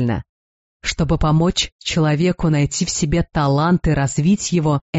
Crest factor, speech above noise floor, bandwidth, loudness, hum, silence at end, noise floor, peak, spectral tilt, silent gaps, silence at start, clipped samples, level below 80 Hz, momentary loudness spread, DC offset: 12 dB; over 73 dB; 8.2 kHz; -18 LUFS; none; 0 s; under -90 dBFS; -6 dBFS; -5.5 dB/octave; 0.29-0.80 s, 1.72-1.79 s, 4.81-4.93 s; 0 s; under 0.1%; -32 dBFS; 5 LU; under 0.1%